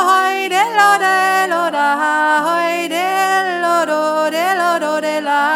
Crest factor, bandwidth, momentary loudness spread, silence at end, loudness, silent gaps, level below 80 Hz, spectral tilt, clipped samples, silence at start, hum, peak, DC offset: 14 dB; 18 kHz; 5 LU; 0 s; -14 LUFS; none; -80 dBFS; -2 dB/octave; under 0.1%; 0 s; none; -2 dBFS; under 0.1%